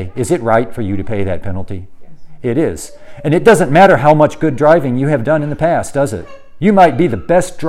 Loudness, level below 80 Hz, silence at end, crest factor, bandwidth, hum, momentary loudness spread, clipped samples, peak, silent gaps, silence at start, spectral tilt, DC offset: -13 LUFS; -38 dBFS; 0 s; 12 dB; 15.5 kHz; none; 15 LU; 0.4%; 0 dBFS; none; 0 s; -6.5 dB/octave; under 0.1%